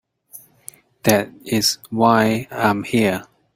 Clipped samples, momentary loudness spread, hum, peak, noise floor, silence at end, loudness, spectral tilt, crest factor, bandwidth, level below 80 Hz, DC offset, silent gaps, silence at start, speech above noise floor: under 0.1%; 10 LU; none; 0 dBFS; -46 dBFS; 0.3 s; -19 LUFS; -4 dB/octave; 20 dB; 16.5 kHz; -56 dBFS; under 0.1%; none; 0.35 s; 28 dB